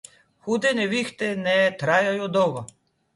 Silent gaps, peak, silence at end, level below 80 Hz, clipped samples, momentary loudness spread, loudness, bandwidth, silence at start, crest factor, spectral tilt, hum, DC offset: none; -6 dBFS; 0.5 s; -66 dBFS; under 0.1%; 11 LU; -22 LUFS; 11.5 kHz; 0.45 s; 18 dB; -4.5 dB/octave; none; under 0.1%